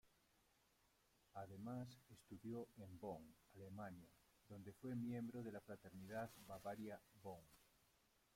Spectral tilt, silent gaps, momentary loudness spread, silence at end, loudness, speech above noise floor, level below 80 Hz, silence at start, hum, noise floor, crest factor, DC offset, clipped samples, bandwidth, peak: -7 dB/octave; none; 12 LU; 0.6 s; -55 LUFS; 26 dB; -82 dBFS; 0.05 s; none; -80 dBFS; 18 dB; under 0.1%; under 0.1%; 16.5 kHz; -38 dBFS